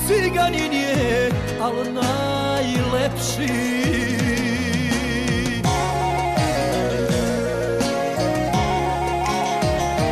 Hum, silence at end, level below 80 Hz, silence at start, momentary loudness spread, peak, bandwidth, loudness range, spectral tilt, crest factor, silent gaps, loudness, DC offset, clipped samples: none; 0 s; -36 dBFS; 0 s; 3 LU; -10 dBFS; 14.5 kHz; 0 LU; -5 dB/octave; 12 dB; none; -21 LUFS; under 0.1%; under 0.1%